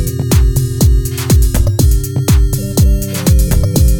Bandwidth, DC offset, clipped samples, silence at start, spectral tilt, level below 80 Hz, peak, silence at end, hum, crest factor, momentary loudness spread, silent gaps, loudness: 20 kHz; under 0.1%; under 0.1%; 0 s; -6 dB/octave; -14 dBFS; 0 dBFS; 0 s; none; 10 dB; 3 LU; none; -13 LUFS